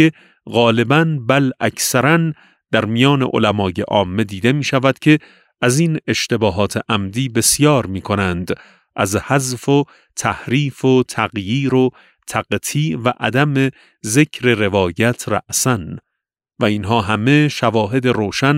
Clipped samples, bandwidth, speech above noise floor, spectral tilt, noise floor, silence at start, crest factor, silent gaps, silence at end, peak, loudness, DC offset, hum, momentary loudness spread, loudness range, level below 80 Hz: under 0.1%; 16 kHz; 63 dB; -5 dB/octave; -79 dBFS; 0 s; 16 dB; none; 0 s; 0 dBFS; -16 LUFS; under 0.1%; none; 7 LU; 2 LU; -50 dBFS